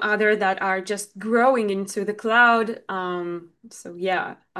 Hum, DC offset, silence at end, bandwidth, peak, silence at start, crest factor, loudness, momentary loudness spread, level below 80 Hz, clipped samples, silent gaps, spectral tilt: none; under 0.1%; 0 s; 12.5 kHz; -4 dBFS; 0 s; 18 dB; -22 LUFS; 13 LU; -74 dBFS; under 0.1%; none; -4 dB/octave